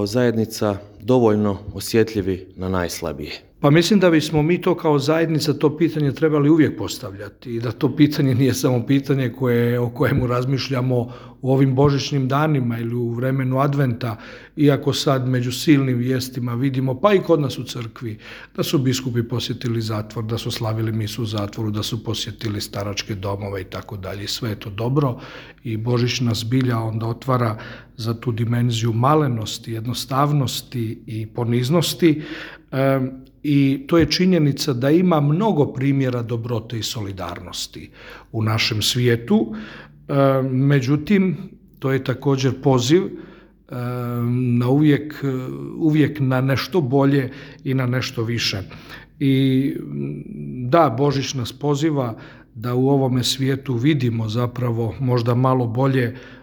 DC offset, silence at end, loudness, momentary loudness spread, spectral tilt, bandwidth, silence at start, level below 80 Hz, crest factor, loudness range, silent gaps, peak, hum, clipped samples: under 0.1%; 0.05 s; -20 LUFS; 13 LU; -6 dB/octave; over 20 kHz; 0 s; -50 dBFS; 20 dB; 5 LU; none; 0 dBFS; none; under 0.1%